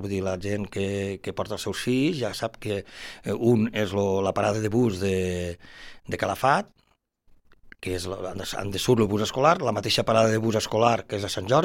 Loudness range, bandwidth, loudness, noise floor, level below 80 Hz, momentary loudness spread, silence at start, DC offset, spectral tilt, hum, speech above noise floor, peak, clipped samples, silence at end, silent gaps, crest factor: 6 LU; 16.5 kHz; -25 LUFS; -68 dBFS; -54 dBFS; 11 LU; 0 s; under 0.1%; -5.5 dB/octave; none; 43 dB; -4 dBFS; under 0.1%; 0 s; none; 20 dB